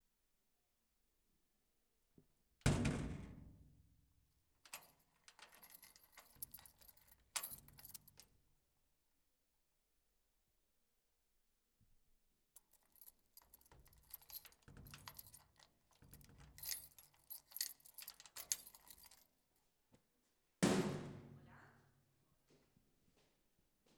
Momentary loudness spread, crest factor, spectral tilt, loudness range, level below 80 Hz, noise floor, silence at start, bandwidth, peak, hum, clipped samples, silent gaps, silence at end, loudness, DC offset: 25 LU; 34 dB; -4.5 dB/octave; 15 LU; -64 dBFS; -85 dBFS; 2.65 s; over 20 kHz; -18 dBFS; none; under 0.1%; none; 2.25 s; -46 LUFS; under 0.1%